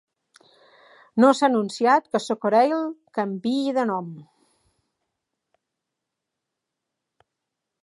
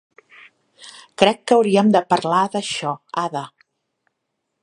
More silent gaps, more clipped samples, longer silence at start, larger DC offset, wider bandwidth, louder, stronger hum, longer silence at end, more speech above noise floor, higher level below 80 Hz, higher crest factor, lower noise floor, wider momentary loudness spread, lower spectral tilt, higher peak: neither; neither; first, 1.15 s vs 0.8 s; neither; about the same, 11.5 kHz vs 11 kHz; second, -22 LUFS vs -19 LUFS; neither; first, 3.6 s vs 1.15 s; first, 62 dB vs 58 dB; second, -80 dBFS vs -66 dBFS; about the same, 22 dB vs 20 dB; first, -83 dBFS vs -76 dBFS; second, 12 LU vs 17 LU; about the same, -5.5 dB/octave vs -5 dB/octave; second, -4 dBFS vs 0 dBFS